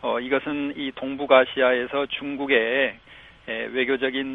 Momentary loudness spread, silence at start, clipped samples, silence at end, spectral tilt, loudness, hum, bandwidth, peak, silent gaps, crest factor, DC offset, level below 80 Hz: 12 LU; 0 s; under 0.1%; 0 s; -6.5 dB/octave; -23 LUFS; none; 4 kHz; -2 dBFS; none; 20 dB; under 0.1%; -60 dBFS